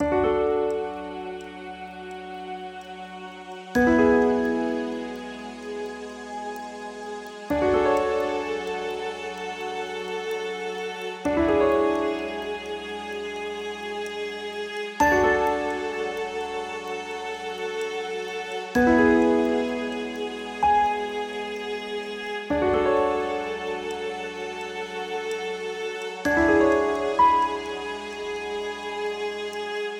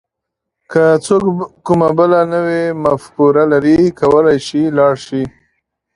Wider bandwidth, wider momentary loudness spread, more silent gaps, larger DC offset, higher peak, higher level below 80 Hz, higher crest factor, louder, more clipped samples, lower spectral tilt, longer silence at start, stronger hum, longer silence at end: first, 17 kHz vs 11.5 kHz; first, 16 LU vs 8 LU; neither; neither; second, -8 dBFS vs 0 dBFS; about the same, -50 dBFS vs -48 dBFS; about the same, 18 dB vs 14 dB; second, -26 LUFS vs -13 LUFS; neither; second, -5 dB/octave vs -7 dB/octave; second, 0 s vs 0.7 s; neither; second, 0 s vs 0.65 s